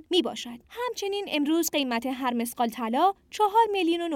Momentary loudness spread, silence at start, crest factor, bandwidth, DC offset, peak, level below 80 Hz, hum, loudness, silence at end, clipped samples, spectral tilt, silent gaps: 10 LU; 0.1 s; 16 dB; 17.5 kHz; under 0.1%; -10 dBFS; -66 dBFS; none; -26 LUFS; 0 s; under 0.1%; -2.5 dB/octave; none